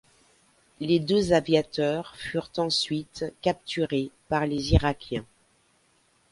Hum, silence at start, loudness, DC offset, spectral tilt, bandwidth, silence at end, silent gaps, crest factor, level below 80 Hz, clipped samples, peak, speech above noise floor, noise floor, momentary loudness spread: none; 0.8 s; -27 LUFS; under 0.1%; -5.5 dB/octave; 11.5 kHz; 1.05 s; none; 20 dB; -40 dBFS; under 0.1%; -6 dBFS; 40 dB; -65 dBFS; 10 LU